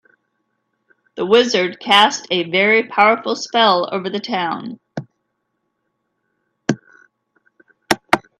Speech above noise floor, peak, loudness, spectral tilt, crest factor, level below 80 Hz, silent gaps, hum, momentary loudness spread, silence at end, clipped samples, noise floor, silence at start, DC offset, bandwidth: 56 dB; 0 dBFS; -16 LUFS; -3.5 dB/octave; 20 dB; -66 dBFS; none; none; 16 LU; 0.2 s; under 0.1%; -72 dBFS; 1.15 s; under 0.1%; 14.5 kHz